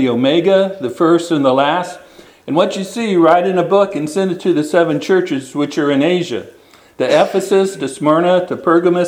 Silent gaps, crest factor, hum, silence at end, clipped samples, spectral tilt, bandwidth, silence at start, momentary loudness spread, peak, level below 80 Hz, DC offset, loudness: none; 14 dB; none; 0 s; under 0.1%; -5.5 dB/octave; 15 kHz; 0 s; 8 LU; 0 dBFS; -62 dBFS; under 0.1%; -14 LUFS